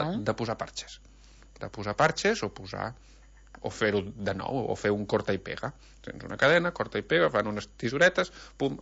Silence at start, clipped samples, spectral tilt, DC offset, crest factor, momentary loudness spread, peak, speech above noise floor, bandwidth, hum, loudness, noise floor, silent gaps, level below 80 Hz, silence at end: 0 s; under 0.1%; -5 dB/octave; under 0.1%; 20 dB; 17 LU; -10 dBFS; 24 dB; 8 kHz; none; -28 LUFS; -53 dBFS; none; -54 dBFS; 0 s